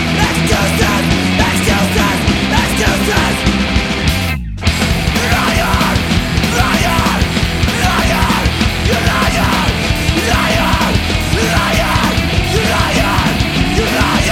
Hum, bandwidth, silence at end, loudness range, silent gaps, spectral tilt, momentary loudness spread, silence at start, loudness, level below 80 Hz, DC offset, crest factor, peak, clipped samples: none; 17.5 kHz; 0 s; 1 LU; none; -4.5 dB/octave; 2 LU; 0 s; -13 LUFS; -20 dBFS; under 0.1%; 12 dB; 0 dBFS; under 0.1%